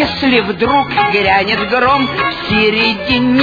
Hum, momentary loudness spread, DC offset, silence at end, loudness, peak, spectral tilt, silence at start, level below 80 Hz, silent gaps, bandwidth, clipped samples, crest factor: none; 3 LU; under 0.1%; 0 s; -12 LUFS; 0 dBFS; -6.5 dB/octave; 0 s; -38 dBFS; none; 5 kHz; under 0.1%; 12 dB